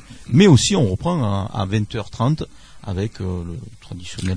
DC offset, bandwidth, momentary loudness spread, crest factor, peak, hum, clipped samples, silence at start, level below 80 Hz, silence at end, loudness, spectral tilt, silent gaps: under 0.1%; 10.5 kHz; 22 LU; 20 dB; 0 dBFS; none; under 0.1%; 0.1 s; -42 dBFS; 0 s; -19 LUFS; -6 dB/octave; none